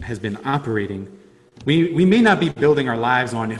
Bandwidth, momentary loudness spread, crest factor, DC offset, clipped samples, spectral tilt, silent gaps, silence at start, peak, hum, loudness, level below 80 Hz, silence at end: 11.5 kHz; 14 LU; 16 dB; under 0.1%; under 0.1%; -6.5 dB/octave; none; 0 s; -2 dBFS; none; -18 LUFS; -48 dBFS; 0 s